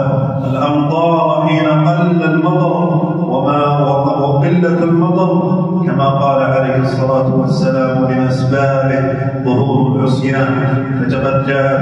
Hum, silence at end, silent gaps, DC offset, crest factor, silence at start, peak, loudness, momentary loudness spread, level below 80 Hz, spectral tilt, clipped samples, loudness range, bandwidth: none; 0 s; none; under 0.1%; 10 dB; 0 s; -2 dBFS; -13 LUFS; 3 LU; -50 dBFS; -8.5 dB/octave; under 0.1%; 1 LU; 8 kHz